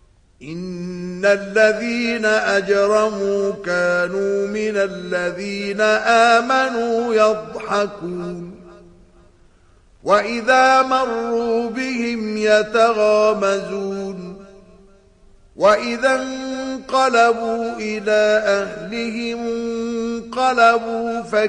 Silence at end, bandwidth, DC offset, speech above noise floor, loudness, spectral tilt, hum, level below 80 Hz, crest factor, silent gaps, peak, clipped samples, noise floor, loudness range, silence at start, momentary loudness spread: 0 s; 10.5 kHz; under 0.1%; 34 dB; -18 LUFS; -4 dB/octave; none; -54 dBFS; 16 dB; none; -2 dBFS; under 0.1%; -51 dBFS; 4 LU; 0.4 s; 12 LU